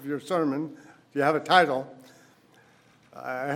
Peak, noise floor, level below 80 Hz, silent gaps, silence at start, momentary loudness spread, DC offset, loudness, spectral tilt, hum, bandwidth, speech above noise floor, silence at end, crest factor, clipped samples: -4 dBFS; -59 dBFS; -82 dBFS; none; 0 s; 18 LU; under 0.1%; -25 LUFS; -5 dB/octave; none; 16 kHz; 33 dB; 0 s; 24 dB; under 0.1%